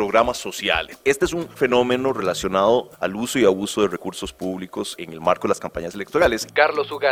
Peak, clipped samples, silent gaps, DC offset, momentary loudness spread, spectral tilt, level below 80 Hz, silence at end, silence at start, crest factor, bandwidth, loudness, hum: -2 dBFS; under 0.1%; none; under 0.1%; 11 LU; -4 dB/octave; -46 dBFS; 0 s; 0 s; 20 dB; 16.5 kHz; -21 LUFS; none